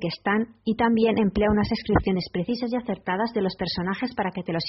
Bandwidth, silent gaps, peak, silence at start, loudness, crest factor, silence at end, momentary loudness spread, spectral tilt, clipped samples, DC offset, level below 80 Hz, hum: 6 kHz; none; -6 dBFS; 0 s; -25 LUFS; 18 dB; 0 s; 7 LU; -5 dB/octave; under 0.1%; under 0.1%; -42 dBFS; none